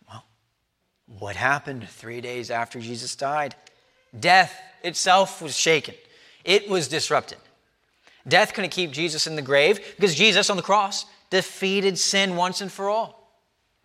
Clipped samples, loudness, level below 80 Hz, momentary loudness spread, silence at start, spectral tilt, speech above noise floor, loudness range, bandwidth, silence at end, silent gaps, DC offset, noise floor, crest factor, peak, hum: under 0.1%; -22 LUFS; -72 dBFS; 15 LU; 0.1 s; -2.5 dB/octave; 51 dB; 8 LU; 15.5 kHz; 0.75 s; none; under 0.1%; -74 dBFS; 22 dB; -2 dBFS; none